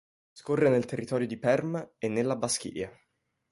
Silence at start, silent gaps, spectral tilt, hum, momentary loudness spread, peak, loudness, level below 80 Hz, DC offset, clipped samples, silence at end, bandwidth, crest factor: 0.35 s; none; -5 dB/octave; none; 13 LU; -12 dBFS; -29 LUFS; -66 dBFS; under 0.1%; under 0.1%; 0.6 s; 11.5 kHz; 18 dB